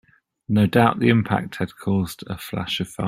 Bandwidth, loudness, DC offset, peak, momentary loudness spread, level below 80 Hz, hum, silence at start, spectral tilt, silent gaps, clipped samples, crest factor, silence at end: 16 kHz; -21 LUFS; under 0.1%; -2 dBFS; 12 LU; -52 dBFS; none; 0.5 s; -6.5 dB/octave; none; under 0.1%; 20 dB; 0 s